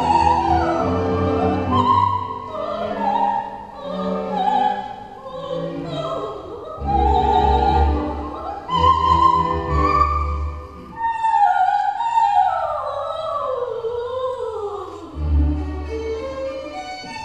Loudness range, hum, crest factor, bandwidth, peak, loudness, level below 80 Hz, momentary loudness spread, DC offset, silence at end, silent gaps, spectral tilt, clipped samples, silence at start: 7 LU; none; 18 dB; 8.6 kHz; -2 dBFS; -20 LUFS; -30 dBFS; 14 LU; 0.1%; 0 s; none; -7 dB/octave; under 0.1%; 0 s